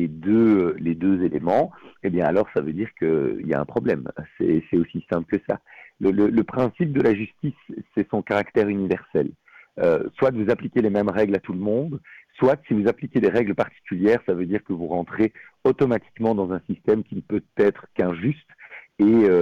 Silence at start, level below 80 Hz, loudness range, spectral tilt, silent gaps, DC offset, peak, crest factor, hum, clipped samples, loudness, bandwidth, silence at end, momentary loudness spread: 0 s; -56 dBFS; 2 LU; -9.5 dB/octave; none; under 0.1%; -10 dBFS; 12 dB; none; under 0.1%; -23 LUFS; 6.8 kHz; 0 s; 8 LU